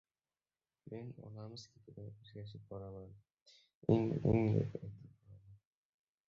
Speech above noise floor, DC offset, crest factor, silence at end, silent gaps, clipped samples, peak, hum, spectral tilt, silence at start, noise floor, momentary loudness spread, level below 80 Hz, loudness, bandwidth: over 52 dB; under 0.1%; 24 dB; 0.75 s; 3.42-3.46 s, 3.75-3.81 s; under 0.1%; -16 dBFS; none; -9 dB/octave; 0.85 s; under -90 dBFS; 21 LU; -62 dBFS; -38 LUFS; 7.2 kHz